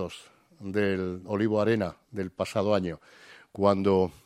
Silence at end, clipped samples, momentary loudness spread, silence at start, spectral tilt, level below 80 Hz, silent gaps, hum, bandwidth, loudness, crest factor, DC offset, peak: 0.15 s; under 0.1%; 16 LU; 0 s; -7 dB/octave; -62 dBFS; none; none; 13.5 kHz; -28 LUFS; 20 dB; under 0.1%; -8 dBFS